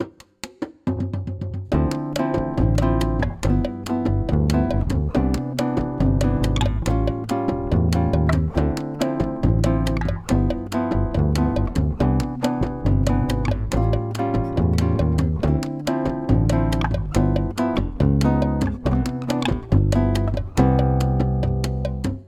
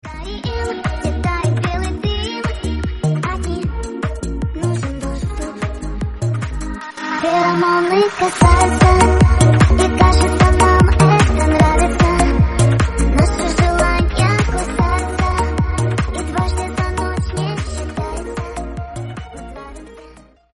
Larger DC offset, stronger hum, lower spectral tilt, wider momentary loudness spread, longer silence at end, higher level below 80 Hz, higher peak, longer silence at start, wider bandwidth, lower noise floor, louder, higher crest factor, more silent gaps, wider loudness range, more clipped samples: neither; neither; first, -7.5 dB/octave vs -6 dB/octave; second, 5 LU vs 14 LU; second, 0.05 s vs 0.45 s; second, -28 dBFS vs -22 dBFS; second, -4 dBFS vs 0 dBFS; about the same, 0 s vs 0.05 s; first, 15 kHz vs 11.5 kHz; about the same, -40 dBFS vs -43 dBFS; second, -22 LUFS vs -16 LUFS; about the same, 16 dB vs 16 dB; neither; second, 1 LU vs 11 LU; neither